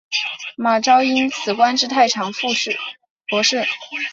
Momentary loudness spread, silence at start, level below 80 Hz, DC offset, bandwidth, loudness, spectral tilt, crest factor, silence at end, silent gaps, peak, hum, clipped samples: 10 LU; 0.1 s; -68 dBFS; under 0.1%; 7.8 kHz; -18 LUFS; -2 dB/octave; 18 dB; 0 s; 3.10-3.16 s; -2 dBFS; none; under 0.1%